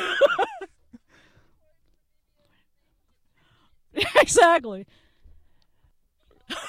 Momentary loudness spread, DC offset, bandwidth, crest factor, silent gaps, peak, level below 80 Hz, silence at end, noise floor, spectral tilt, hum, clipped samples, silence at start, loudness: 24 LU; under 0.1%; 16 kHz; 22 dB; none; -4 dBFS; -56 dBFS; 0 s; -68 dBFS; -2 dB/octave; none; under 0.1%; 0 s; -20 LUFS